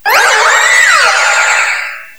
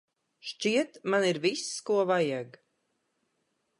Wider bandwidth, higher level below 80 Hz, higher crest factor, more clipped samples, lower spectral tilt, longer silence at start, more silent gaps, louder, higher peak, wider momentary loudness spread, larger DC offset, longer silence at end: first, over 20 kHz vs 11.5 kHz; first, -56 dBFS vs -84 dBFS; second, 10 dB vs 18 dB; first, 0.7% vs under 0.1%; second, 3 dB/octave vs -4 dB/octave; second, 0.05 s vs 0.45 s; neither; first, -7 LUFS vs -29 LUFS; first, 0 dBFS vs -12 dBFS; second, 6 LU vs 15 LU; first, 1% vs under 0.1%; second, 0.1 s vs 1.3 s